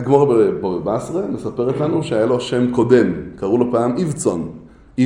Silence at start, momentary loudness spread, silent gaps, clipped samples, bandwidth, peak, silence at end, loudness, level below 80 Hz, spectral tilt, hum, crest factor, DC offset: 0 s; 10 LU; none; under 0.1%; 11.5 kHz; 0 dBFS; 0 s; -18 LUFS; -48 dBFS; -6.5 dB/octave; none; 16 dB; under 0.1%